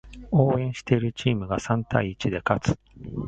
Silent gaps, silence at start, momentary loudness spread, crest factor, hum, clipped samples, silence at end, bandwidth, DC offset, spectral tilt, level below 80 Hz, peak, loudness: none; 0.05 s; 6 LU; 22 dB; none; under 0.1%; 0 s; 8.8 kHz; under 0.1%; -7 dB/octave; -46 dBFS; -2 dBFS; -25 LUFS